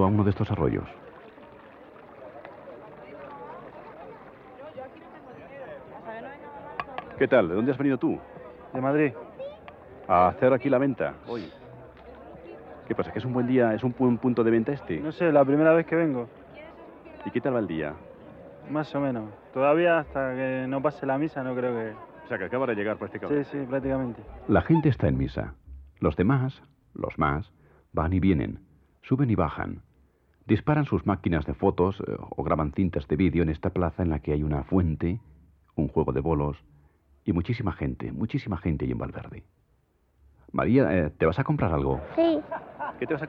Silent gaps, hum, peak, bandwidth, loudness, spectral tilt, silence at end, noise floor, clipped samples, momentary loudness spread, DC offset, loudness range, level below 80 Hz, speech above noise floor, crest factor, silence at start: none; none; -8 dBFS; 5.8 kHz; -26 LUFS; -10.5 dB/octave; 0 s; -67 dBFS; under 0.1%; 22 LU; under 0.1%; 9 LU; -46 dBFS; 41 dB; 20 dB; 0 s